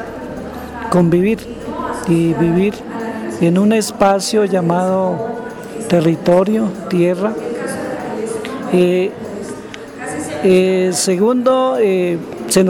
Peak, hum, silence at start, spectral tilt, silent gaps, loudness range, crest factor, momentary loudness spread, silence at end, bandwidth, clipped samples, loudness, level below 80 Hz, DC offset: -2 dBFS; none; 0 s; -6 dB/octave; none; 3 LU; 12 dB; 14 LU; 0 s; 17 kHz; under 0.1%; -16 LUFS; -46 dBFS; under 0.1%